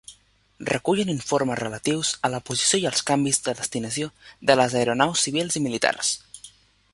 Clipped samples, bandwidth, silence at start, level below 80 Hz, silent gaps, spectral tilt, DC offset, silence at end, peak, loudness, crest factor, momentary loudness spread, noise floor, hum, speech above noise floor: under 0.1%; 11.5 kHz; 0.1 s; -60 dBFS; none; -3 dB/octave; under 0.1%; 0.45 s; -2 dBFS; -23 LUFS; 22 dB; 9 LU; -56 dBFS; none; 32 dB